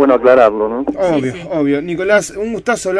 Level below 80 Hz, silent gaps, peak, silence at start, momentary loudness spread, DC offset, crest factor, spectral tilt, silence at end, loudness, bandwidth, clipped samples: -46 dBFS; none; 0 dBFS; 0 s; 10 LU; under 0.1%; 14 dB; -5 dB/octave; 0 s; -14 LUFS; 11 kHz; under 0.1%